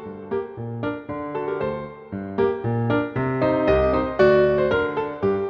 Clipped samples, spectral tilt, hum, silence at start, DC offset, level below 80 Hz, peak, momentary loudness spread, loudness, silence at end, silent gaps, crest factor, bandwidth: under 0.1%; -9 dB/octave; none; 0 s; under 0.1%; -42 dBFS; -4 dBFS; 12 LU; -22 LUFS; 0 s; none; 18 dB; 6.2 kHz